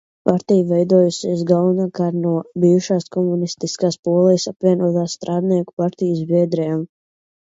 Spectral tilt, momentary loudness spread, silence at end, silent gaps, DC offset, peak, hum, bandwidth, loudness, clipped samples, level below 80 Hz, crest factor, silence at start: -7 dB/octave; 7 LU; 0.75 s; 3.99-4.03 s, 5.73-5.77 s; under 0.1%; 0 dBFS; none; 7.8 kHz; -18 LUFS; under 0.1%; -64 dBFS; 18 dB; 0.25 s